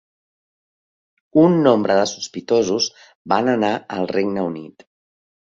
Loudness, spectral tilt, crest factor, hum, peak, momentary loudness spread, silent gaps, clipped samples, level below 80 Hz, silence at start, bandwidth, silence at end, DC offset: -19 LUFS; -5 dB/octave; 18 dB; none; -2 dBFS; 10 LU; 3.15-3.25 s; under 0.1%; -60 dBFS; 1.35 s; 7.6 kHz; 0.7 s; under 0.1%